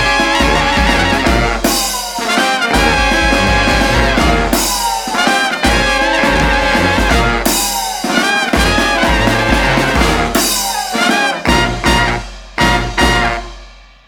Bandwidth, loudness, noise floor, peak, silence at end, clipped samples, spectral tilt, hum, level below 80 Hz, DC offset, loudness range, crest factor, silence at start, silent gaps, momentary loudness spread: 19 kHz; -12 LUFS; -37 dBFS; 0 dBFS; 0.3 s; under 0.1%; -3.5 dB/octave; none; -22 dBFS; under 0.1%; 1 LU; 12 dB; 0 s; none; 4 LU